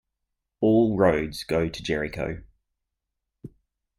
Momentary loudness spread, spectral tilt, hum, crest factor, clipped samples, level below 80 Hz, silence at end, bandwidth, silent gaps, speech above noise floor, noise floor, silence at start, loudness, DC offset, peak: 12 LU; -6.5 dB/octave; none; 20 dB; under 0.1%; -48 dBFS; 0.5 s; 14 kHz; none; 58 dB; -83 dBFS; 0.6 s; -24 LUFS; under 0.1%; -8 dBFS